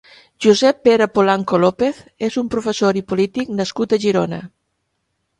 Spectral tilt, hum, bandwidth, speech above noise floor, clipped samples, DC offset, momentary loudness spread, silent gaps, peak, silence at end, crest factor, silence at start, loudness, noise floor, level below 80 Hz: -5.5 dB/octave; none; 11.5 kHz; 55 dB; under 0.1%; under 0.1%; 9 LU; none; 0 dBFS; 0.95 s; 18 dB; 0.4 s; -17 LUFS; -71 dBFS; -54 dBFS